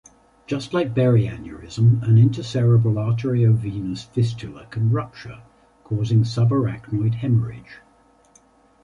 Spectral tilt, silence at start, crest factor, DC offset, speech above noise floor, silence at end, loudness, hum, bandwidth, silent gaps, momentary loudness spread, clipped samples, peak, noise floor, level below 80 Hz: -8.5 dB/octave; 0.5 s; 16 dB; under 0.1%; 36 dB; 1.05 s; -21 LUFS; none; 7.6 kHz; none; 16 LU; under 0.1%; -6 dBFS; -56 dBFS; -48 dBFS